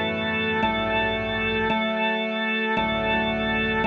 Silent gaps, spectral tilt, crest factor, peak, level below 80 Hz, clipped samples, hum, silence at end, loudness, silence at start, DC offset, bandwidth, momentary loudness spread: none; -6.5 dB/octave; 14 dB; -10 dBFS; -44 dBFS; under 0.1%; none; 0 s; -23 LUFS; 0 s; under 0.1%; 6.6 kHz; 1 LU